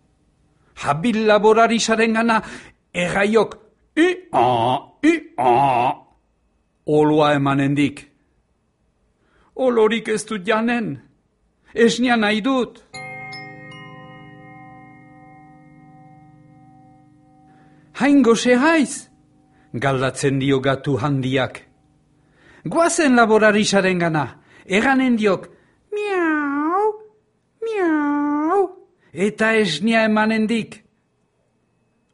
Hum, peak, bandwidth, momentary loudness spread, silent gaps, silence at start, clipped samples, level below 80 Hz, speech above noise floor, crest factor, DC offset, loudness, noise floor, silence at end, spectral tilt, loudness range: none; -2 dBFS; 11.5 kHz; 18 LU; none; 0.75 s; under 0.1%; -56 dBFS; 48 dB; 18 dB; under 0.1%; -18 LUFS; -65 dBFS; 1.35 s; -5 dB/octave; 5 LU